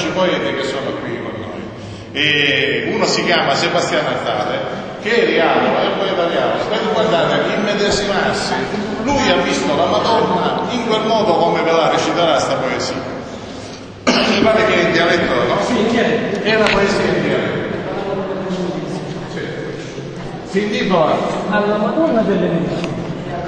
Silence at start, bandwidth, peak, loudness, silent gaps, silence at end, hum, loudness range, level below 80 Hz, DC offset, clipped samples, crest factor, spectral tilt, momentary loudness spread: 0 s; 9.8 kHz; 0 dBFS; -16 LUFS; none; 0 s; none; 4 LU; -44 dBFS; under 0.1%; under 0.1%; 16 dB; -4.5 dB/octave; 12 LU